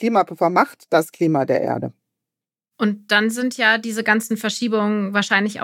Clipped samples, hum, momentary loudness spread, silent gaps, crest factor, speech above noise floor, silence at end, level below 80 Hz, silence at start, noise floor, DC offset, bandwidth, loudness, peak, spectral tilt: under 0.1%; none; 6 LU; none; 18 dB; 68 dB; 0 s; -84 dBFS; 0 s; -87 dBFS; under 0.1%; 16.5 kHz; -19 LUFS; -2 dBFS; -4.5 dB/octave